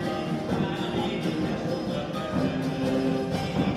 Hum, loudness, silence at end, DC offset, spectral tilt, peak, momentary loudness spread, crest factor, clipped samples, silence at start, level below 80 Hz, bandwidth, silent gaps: none; -28 LUFS; 0 s; under 0.1%; -6.5 dB/octave; -14 dBFS; 3 LU; 14 dB; under 0.1%; 0 s; -50 dBFS; 14.5 kHz; none